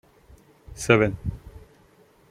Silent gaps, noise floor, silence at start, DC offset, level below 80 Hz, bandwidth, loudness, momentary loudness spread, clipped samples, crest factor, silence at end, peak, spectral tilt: none; -57 dBFS; 0.7 s; under 0.1%; -46 dBFS; 15.5 kHz; -23 LUFS; 25 LU; under 0.1%; 26 dB; 0.75 s; -2 dBFS; -5.5 dB/octave